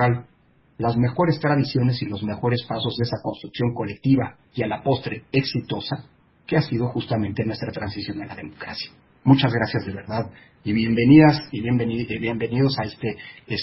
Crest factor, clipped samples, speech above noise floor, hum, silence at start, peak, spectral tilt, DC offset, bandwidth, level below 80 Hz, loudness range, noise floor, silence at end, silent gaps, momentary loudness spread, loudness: 20 dB; under 0.1%; 36 dB; none; 0 s; -2 dBFS; -11 dB/octave; under 0.1%; 5.8 kHz; -50 dBFS; 6 LU; -58 dBFS; 0 s; none; 13 LU; -23 LUFS